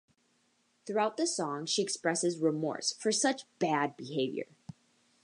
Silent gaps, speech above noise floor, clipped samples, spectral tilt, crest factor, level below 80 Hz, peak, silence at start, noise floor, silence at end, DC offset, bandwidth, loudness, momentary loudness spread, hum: none; 41 dB; under 0.1%; -3 dB/octave; 18 dB; -84 dBFS; -14 dBFS; 0.85 s; -73 dBFS; 0.8 s; under 0.1%; 11.5 kHz; -32 LUFS; 6 LU; none